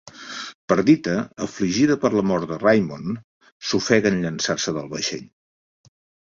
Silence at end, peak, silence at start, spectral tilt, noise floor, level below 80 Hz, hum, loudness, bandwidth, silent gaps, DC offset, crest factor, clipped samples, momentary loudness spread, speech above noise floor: 1.05 s; -2 dBFS; 0.05 s; -5 dB/octave; under -90 dBFS; -56 dBFS; none; -21 LUFS; 7.6 kHz; 0.55-0.68 s, 3.24-3.41 s, 3.52-3.60 s; under 0.1%; 20 dB; under 0.1%; 15 LU; over 69 dB